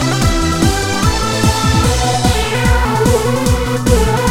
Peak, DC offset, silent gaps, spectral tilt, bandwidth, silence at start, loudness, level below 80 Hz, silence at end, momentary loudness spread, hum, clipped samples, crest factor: 0 dBFS; under 0.1%; none; -4.5 dB/octave; 17 kHz; 0 s; -14 LUFS; -20 dBFS; 0 s; 2 LU; none; under 0.1%; 12 dB